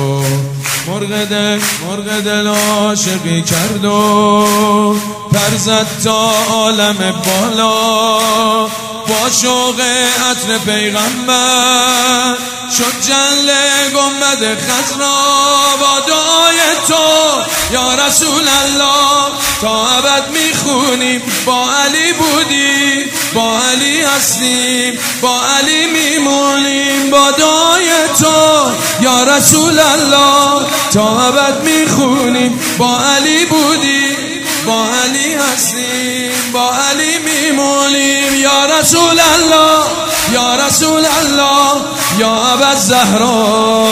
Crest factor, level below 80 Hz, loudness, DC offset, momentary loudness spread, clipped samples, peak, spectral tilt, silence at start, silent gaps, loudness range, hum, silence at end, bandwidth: 10 dB; -44 dBFS; -10 LUFS; under 0.1%; 6 LU; 0.1%; 0 dBFS; -2 dB/octave; 0 s; none; 3 LU; none; 0 s; over 20 kHz